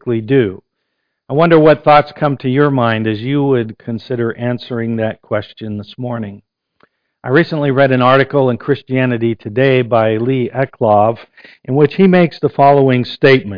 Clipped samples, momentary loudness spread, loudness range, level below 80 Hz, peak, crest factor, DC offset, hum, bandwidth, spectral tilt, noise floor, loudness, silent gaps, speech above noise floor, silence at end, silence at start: under 0.1%; 13 LU; 7 LU; -50 dBFS; 0 dBFS; 14 dB; under 0.1%; none; 5.2 kHz; -9.5 dB/octave; -71 dBFS; -13 LUFS; none; 58 dB; 0 s; 0.05 s